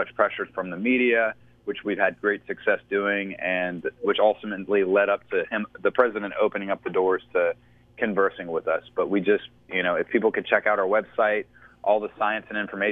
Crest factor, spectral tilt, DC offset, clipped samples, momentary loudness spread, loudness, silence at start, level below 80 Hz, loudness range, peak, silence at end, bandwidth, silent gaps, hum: 20 dB; -8 dB/octave; under 0.1%; under 0.1%; 8 LU; -25 LUFS; 0 s; -64 dBFS; 2 LU; -4 dBFS; 0 s; 3.9 kHz; none; none